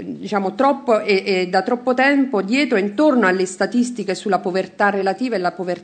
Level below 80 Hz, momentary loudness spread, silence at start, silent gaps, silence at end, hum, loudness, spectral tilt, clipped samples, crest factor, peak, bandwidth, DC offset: -70 dBFS; 7 LU; 0 s; none; 0 s; none; -18 LUFS; -5 dB/octave; under 0.1%; 16 dB; -2 dBFS; 9.4 kHz; under 0.1%